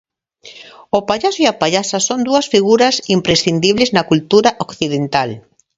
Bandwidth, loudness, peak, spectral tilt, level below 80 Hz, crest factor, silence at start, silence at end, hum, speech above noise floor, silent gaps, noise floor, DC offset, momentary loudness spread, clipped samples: 8 kHz; -14 LUFS; 0 dBFS; -4 dB/octave; -50 dBFS; 16 dB; 0.45 s; 0.35 s; none; 28 dB; none; -42 dBFS; under 0.1%; 7 LU; under 0.1%